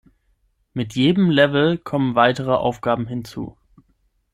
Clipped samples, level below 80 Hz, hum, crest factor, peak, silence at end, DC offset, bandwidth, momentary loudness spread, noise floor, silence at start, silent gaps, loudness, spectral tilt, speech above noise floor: under 0.1%; -52 dBFS; none; 20 dB; -2 dBFS; 0.85 s; under 0.1%; 13 kHz; 17 LU; -65 dBFS; 0.75 s; none; -19 LUFS; -7 dB/octave; 46 dB